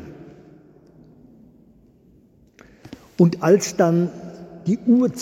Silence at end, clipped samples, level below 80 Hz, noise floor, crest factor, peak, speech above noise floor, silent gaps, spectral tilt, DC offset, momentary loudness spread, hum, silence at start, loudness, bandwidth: 0 s; under 0.1%; -60 dBFS; -54 dBFS; 20 dB; -2 dBFS; 37 dB; none; -6.5 dB/octave; under 0.1%; 23 LU; none; 0 s; -19 LUFS; 15.5 kHz